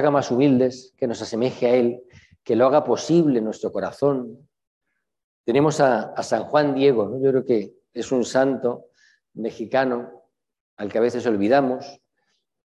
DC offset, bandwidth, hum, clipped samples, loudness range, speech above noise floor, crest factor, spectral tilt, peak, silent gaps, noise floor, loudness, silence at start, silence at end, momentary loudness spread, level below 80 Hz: under 0.1%; 11 kHz; none; under 0.1%; 4 LU; 52 dB; 18 dB; -6 dB/octave; -4 dBFS; 4.67-4.81 s, 5.24-5.44 s, 10.61-10.77 s; -72 dBFS; -21 LUFS; 0 s; 0.8 s; 14 LU; -64 dBFS